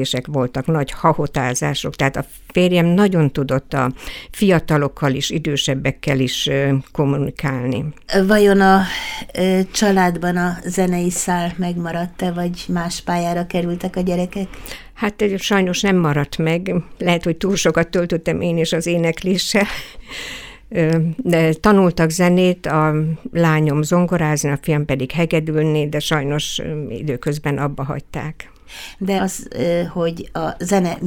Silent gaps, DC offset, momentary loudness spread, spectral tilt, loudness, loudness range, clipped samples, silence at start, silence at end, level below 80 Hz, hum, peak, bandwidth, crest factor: none; under 0.1%; 10 LU; -5.5 dB/octave; -18 LUFS; 6 LU; under 0.1%; 0 s; 0 s; -40 dBFS; none; 0 dBFS; 18 kHz; 18 dB